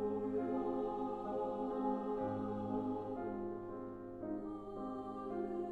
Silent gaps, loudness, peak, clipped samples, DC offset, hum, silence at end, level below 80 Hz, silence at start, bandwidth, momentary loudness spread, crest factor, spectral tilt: none; -41 LUFS; -26 dBFS; under 0.1%; under 0.1%; none; 0 s; -64 dBFS; 0 s; 4.7 kHz; 7 LU; 16 dB; -9.5 dB/octave